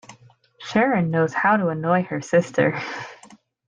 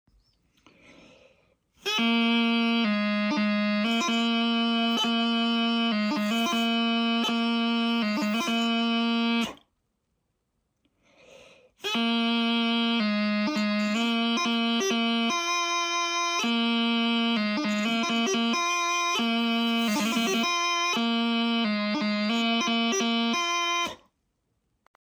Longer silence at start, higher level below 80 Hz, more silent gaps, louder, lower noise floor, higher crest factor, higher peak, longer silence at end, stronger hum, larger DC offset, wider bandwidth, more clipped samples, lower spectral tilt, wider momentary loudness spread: second, 0.1 s vs 1.85 s; first, -64 dBFS vs -72 dBFS; neither; first, -21 LUFS vs -25 LUFS; second, -52 dBFS vs -77 dBFS; first, 18 dB vs 12 dB; first, -6 dBFS vs -14 dBFS; second, 0.4 s vs 1.1 s; neither; neither; second, 9.4 kHz vs over 20 kHz; neither; first, -6.5 dB/octave vs -3 dB/octave; first, 13 LU vs 2 LU